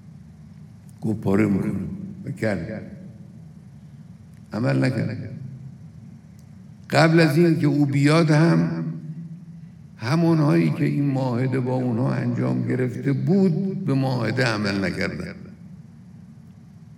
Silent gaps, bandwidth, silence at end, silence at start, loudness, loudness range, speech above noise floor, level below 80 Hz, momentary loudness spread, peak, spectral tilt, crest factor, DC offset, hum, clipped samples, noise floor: none; 13 kHz; 0 s; 0.05 s; -22 LUFS; 9 LU; 24 dB; -58 dBFS; 23 LU; 0 dBFS; -7.5 dB/octave; 22 dB; under 0.1%; none; under 0.1%; -45 dBFS